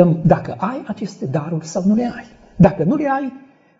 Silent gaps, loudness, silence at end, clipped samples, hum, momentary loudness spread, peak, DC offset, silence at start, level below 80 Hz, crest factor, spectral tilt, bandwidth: none; -18 LUFS; 0.4 s; under 0.1%; none; 13 LU; 0 dBFS; under 0.1%; 0 s; -42 dBFS; 18 dB; -8.5 dB/octave; 7.8 kHz